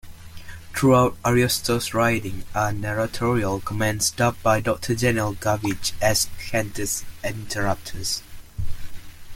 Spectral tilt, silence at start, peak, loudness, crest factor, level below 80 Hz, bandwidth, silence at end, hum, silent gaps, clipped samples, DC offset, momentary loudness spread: -4.5 dB/octave; 0.05 s; -6 dBFS; -23 LUFS; 18 dB; -40 dBFS; 17 kHz; 0 s; none; none; under 0.1%; under 0.1%; 15 LU